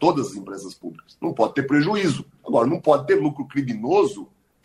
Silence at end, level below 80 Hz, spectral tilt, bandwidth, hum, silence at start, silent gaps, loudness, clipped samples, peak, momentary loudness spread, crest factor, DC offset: 0.4 s; -62 dBFS; -6.5 dB/octave; 12 kHz; none; 0 s; none; -22 LUFS; under 0.1%; -2 dBFS; 16 LU; 18 dB; under 0.1%